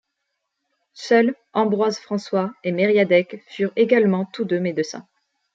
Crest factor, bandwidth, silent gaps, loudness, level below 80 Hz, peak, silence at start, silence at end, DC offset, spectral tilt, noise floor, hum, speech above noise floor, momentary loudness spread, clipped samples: 18 dB; 7.8 kHz; none; -20 LUFS; -72 dBFS; -4 dBFS; 0.95 s; 0.55 s; under 0.1%; -6 dB/octave; -77 dBFS; none; 57 dB; 10 LU; under 0.1%